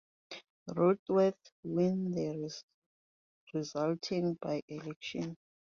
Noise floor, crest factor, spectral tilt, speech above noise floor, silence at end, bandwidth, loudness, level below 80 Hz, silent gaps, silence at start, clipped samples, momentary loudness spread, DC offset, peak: under -90 dBFS; 20 dB; -7 dB/octave; over 56 dB; 0.3 s; 7.4 kHz; -34 LUFS; -74 dBFS; 0.50-0.66 s, 0.99-1.06 s, 1.52-1.63 s, 2.63-2.68 s, 2.74-3.47 s, 4.62-4.68 s, 4.96-5.01 s; 0.3 s; under 0.1%; 18 LU; under 0.1%; -16 dBFS